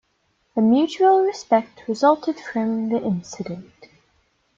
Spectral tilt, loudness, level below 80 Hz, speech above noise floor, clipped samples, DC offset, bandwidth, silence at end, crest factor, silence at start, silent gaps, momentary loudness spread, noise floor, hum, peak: -6 dB/octave; -20 LUFS; -66 dBFS; 48 dB; under 0.1%; under 0.1%; 7.6 kHz; 0.95 s; 18 dB; 0.55 s; none; 14 LU; -68 dBFS; none; -4 dBFS